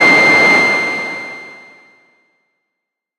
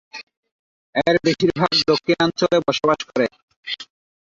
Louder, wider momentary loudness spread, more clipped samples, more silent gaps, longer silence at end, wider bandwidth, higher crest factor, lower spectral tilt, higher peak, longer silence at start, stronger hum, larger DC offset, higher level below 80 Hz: first, -10 LUFS vs -19 LUFS; first, 20 LU vs 13 LU; neither; second, none vs 0.37-0.43 s, 0.51-0.93 s, 3.43-3.48 s, 3.56-3.63 s; first, 1.65 s vs 0.4 s; first, 15.5 kHz vs 7.6 kHz; about the same, 14 dB vs 18 dB; second, -3 dB/octave vs -5 dB/octave; first, 0 dBFS vs -4 dBFS; second, 0 s vs 0.15 s; neither; neither; about the same, -58 dBFS vs -56 dBFS